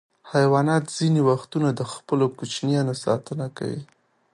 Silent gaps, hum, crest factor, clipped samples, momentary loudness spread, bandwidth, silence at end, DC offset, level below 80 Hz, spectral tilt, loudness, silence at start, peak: none; none; 18 dB; under 0.1%; 11 LU; 11.5 kHz; 0.5 s; under 0.1%; -66 dBFS; -6.5 dB/octave; -23 LUFS; 0.25 s; -6 dBFS